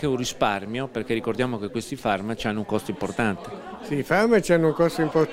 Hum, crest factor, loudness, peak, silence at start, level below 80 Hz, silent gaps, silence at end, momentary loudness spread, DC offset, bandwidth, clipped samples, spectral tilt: none; 20 dB; -24 LUFS; -4 dBFS; 0 s; -52 dBFS; none; 0 s; 10 LU; under 0.1%; 16 kHz; under 0.1%; -5.5 dB/octave